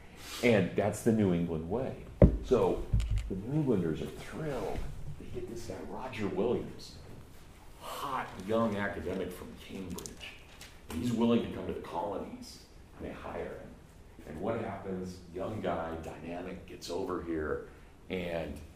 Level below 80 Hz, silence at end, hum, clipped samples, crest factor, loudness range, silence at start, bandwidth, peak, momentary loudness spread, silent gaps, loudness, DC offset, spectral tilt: -44 dBFS; 0 s; none; under 0.1%; 28 dB; 9 LU; 0 s; 15.5 kHz; -6 dBFS; 19 LU; none; -34 LUFS; under 0.1%; -6.5 dB/octave